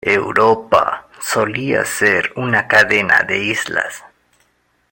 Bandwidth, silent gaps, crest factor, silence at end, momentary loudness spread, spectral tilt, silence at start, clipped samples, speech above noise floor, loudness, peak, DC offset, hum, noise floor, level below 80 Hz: 17 kHz; none; 16 dB; 0.9 s; 9 LU; -3.5 dB/octave; 0.05 s; under 0.1%; 46 dB; -15 LUFS; 0 dBFS; under 0.1%; none; -61 dBFS; -54 dBFS